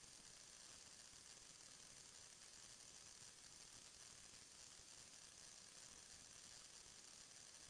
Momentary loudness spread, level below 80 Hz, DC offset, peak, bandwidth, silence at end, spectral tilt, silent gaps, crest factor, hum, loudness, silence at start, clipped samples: 1 LU; -82 dBFS; under 0.1%; -48 dBFS; 11 kHz; 0 s; 0 dB/octave; none; 16 dB; none; -60 LUFS; 0 s; under 0.1%